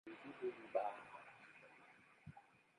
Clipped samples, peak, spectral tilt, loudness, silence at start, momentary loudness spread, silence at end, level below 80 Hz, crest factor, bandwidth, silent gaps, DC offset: under 0.1%; -28 dBFS; -6.5 dB/octave; -48 LUFS; 0.05 s; 20 LU; 0.15 s; -84 dBFS; 24 dB; 10.5 kHz; none; under 0.1%